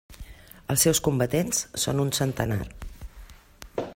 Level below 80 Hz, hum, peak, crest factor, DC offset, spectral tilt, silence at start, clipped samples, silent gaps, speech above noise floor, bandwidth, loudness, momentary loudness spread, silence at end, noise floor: -46 dBFS; none; -6 dBFS; 20 dB; under 0.1%; -4 dB/octave; 0.1 s; under 0.1%; none; 23 dB; 16.5 kHz; -25 LUFS; 25 LU; 0 s; -48 dBFS